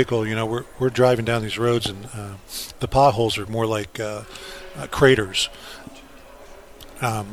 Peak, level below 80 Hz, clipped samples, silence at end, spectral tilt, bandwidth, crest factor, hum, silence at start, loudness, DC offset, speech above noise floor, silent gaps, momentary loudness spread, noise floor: -2 dBFS; -44 dBFS; under 0.1%; 0 s; -5 dB/octave; 19 kHz; 20 dB; none; 0 s; -22 LUFS; under 0.1%; 21 dB; none; 19 LU; -43 dBFS